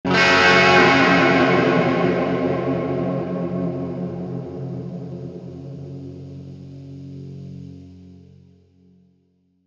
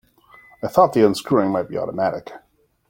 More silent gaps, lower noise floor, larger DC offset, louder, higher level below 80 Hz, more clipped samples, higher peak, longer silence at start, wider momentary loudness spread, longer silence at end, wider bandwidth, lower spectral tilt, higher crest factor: neither; first, -63 dBFS vs -50 dBFS; neither; about the same, -17 LUFS vs -19 LUFS; about the same, -58 dBFS vs -58 dBFS; neither; about the same, 0 dBFS vs 0 dBFS; second, 0.05 s vs 0.65 s; first, 24 LU vs 16 LU; first, 1.55 s vs 0.5 s; second, 8.4 kHz vs 17 kHz; about the same, -5.5 dB/octave vs -6.5 dB/octave; about the same, 20 dB vs 20 dB